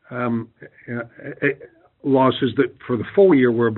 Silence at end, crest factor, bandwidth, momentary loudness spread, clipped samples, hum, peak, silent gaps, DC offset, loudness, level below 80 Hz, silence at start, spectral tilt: 0 s; 16 dB; 4.2 kHz; 17 LU; under 0.1%; none; -4 dBFS; none; under 0.1%; -19 LUFS; -62 dBFS; 0.1 s; -5.5 dB/octave